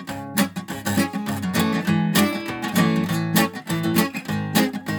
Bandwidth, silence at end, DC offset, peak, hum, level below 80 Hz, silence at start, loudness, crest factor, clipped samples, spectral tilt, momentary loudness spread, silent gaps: 19.5 kHz; 0 s; under 0.1%; -4 dBFS; none; -56 dBFS; 0 s; -22 LUFS; 18 dB; under 0.1%; -5 dB/octave; 6 LU; none